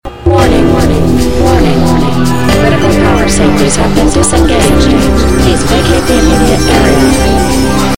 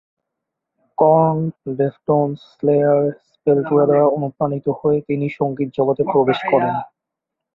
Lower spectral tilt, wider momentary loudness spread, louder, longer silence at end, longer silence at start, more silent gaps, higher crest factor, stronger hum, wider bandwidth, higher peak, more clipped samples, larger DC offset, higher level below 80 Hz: second, -5 dB/octave vs -10 dB/octave; second, 2 LU vs 9 LU; first, -8 LUFS vs -18 LUFS; second, 0 s vs 0.7 s; second, 0 s vs 1 s; neither; second, 8 dB vs 16 dB; neither; first, 17 kHz vs 5.2 kHz; about the same, 0 dBFS vs -2 dBFS; first, 1% vs under 0.1%; first, 10% vs under 0.1%; first, -16 dBFS vs -60 dBFS